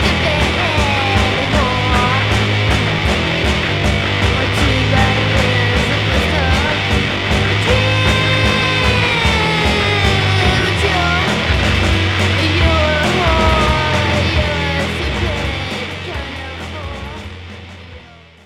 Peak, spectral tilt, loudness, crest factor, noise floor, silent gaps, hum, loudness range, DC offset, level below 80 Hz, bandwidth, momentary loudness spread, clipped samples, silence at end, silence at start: 0 dBFS; -5 dB/octave; -14 LUFS; 14 dB; -39 dBFS; none; none; 5 LU; under 0.1%; -24 dBFS; 14.5 kHz; 10 LU; under 0.1%; 0.3 s; 0 s